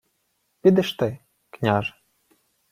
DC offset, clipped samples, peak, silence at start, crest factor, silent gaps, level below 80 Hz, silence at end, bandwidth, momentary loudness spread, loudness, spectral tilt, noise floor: under 0.1%; under 0.1%; -4 dBFS; 0.65 s; 20 dB; none; -60 dBFS; 0.8 s; 15.5 kHz; 12 LU; -23 LUFS; -7 dB/octave; -72 dBFS